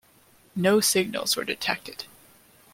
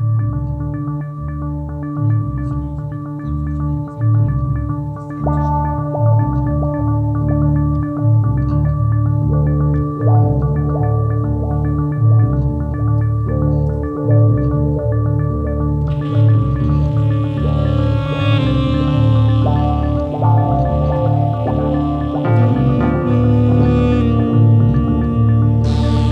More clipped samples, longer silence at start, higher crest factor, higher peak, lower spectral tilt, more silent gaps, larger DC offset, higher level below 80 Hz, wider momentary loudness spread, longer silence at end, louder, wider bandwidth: neither; first, 0.55 s vs 0 s; first, 20 dB vs 12 dB; second, -8 dBFS vs -2 dBFS; second, -3 dB/octave vs -10 dB/octave; neither; neither; second, -66 dBFS vs -24 dBFS; first, 18 LU vs 8 LU; first, 0.7 s vs 0 s; second, -24 LUFS vs -16 LUFS; first, 16.5 kHz vs 4.7 kHz